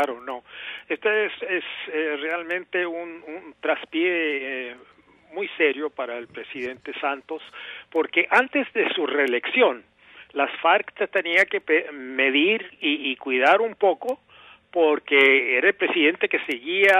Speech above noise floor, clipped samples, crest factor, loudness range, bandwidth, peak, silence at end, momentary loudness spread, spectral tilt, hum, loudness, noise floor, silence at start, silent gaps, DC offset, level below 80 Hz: 27 dB; under 0.1%; 18 dB; 7 LU; 14 kHz; -4 dBFS; 0 s; 16 LU; -3.5 dB/octave; none; -22 LUFS; -50 dBFS; 0 s; none; under 0.1%; -74 dBFS